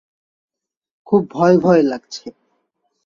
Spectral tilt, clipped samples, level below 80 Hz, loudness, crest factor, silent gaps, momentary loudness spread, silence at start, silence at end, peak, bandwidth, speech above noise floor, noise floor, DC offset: -7.5 dB/octave; under 0.1%; -60 dBFS; -15 LUFS; 18 dB; none; 19 LU; 1.1 s; 0.75 s; -2 dBFS; 7.4 kHz; 55 dB; -70 dBFS; under 0.1%